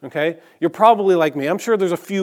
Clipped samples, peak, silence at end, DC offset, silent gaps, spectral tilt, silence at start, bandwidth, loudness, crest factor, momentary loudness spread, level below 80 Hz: under 0.1%; 0 dBFS; 0 s; under 0.1%; none; -5.5 dB/octave; 0.05 s; 17 kHz; -18 LUFS; 18 dB; 10 LU; -76 dBFS